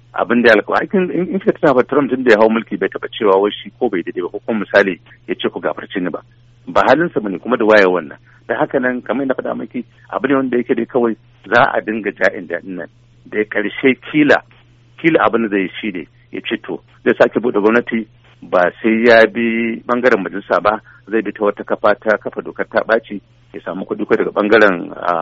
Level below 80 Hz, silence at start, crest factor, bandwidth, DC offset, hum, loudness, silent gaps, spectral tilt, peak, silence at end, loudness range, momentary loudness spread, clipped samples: -54 dBFS; 0.15 s; 16 dB; 7.6 kHz; under 0.1%; none; -16 LUFS; none; -3.5 dB/octave; 0 dBFS; 0 s; 4 LU; 14 LU; under 0.1%